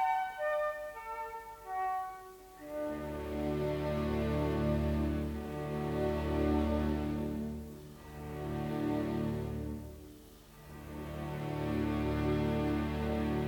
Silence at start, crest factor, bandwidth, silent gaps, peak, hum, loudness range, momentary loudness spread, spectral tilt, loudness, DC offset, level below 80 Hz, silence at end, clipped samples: 0 s; 14 dB; over 20 kHz; none; -20 dBFS; none; 5 LU; 16 LU; -7.5 dB/octave; -36 LUFS; under 0.1%; -46 dBFS; 0 s; under 0.1%